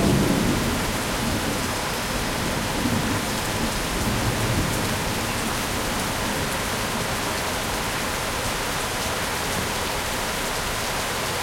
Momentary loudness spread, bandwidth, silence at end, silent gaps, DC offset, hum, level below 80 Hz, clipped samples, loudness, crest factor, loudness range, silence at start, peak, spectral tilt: 2 LU; 16.5 kHz; 0 s; none; under 0.1%; none; -36 dBFS; under 0.1%; -24 LUFS; 16 dB; 1 LU; 0 s; -8 dBFS; -3.5 dB/octave